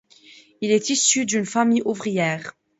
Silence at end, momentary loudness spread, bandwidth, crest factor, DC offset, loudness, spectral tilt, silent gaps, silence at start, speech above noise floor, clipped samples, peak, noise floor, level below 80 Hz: 0.3 s; 7 LU; 8 kHz; 18 dB; under 0.1%; -21 LUFS; -3 dB/octave; none; 0.6 s; 29 dB; under 0.1%; -4 dBFS; -50 dBFS; -68 dBFS